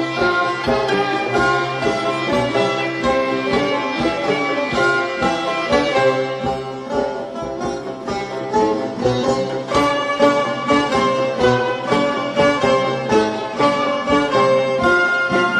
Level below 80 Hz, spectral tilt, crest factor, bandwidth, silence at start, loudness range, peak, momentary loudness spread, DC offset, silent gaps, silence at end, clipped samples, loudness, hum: -44 dBFS; -5 dB/octave; 16 dB; 12 kHz; 0 s; 4 LU; -2 dBFS; 7 LU; under 0.1%; none; 0 s; under 0.1%; -18 LUFS; none